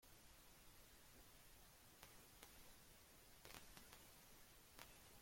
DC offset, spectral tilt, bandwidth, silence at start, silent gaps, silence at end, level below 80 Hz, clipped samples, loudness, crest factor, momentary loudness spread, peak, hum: under 0.1%; -2 dB/octave; 16.5 kHz; 0 s; none; 0 s; -74 dBFS; under 0.1%; -65 LUFS; 30 dB; 5 LU; -34 dBFS; none